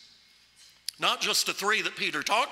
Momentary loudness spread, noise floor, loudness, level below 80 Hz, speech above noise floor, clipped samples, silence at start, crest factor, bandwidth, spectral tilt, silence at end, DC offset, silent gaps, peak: 9 LU; -59 dBFS; -26 LUFS; -78 dBFS; 31 dB; under 0.1%; 1 s; 22 dB; 16 kHz; -0.5 dB/octave; 0 s; under 0.1%; none; -8 dBFS